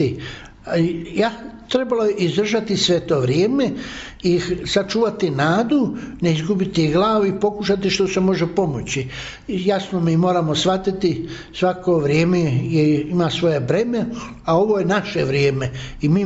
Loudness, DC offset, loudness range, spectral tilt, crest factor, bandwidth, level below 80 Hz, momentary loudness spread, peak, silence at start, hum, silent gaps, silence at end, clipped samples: -19 LUFS; under 0.1%; 1 LU; -5.5 dB/octave; 14 dB; 8 kHz; -44 dBFS; 8 LU; -6 dBFS; 0 s; none; none; 0 s; under 0.1%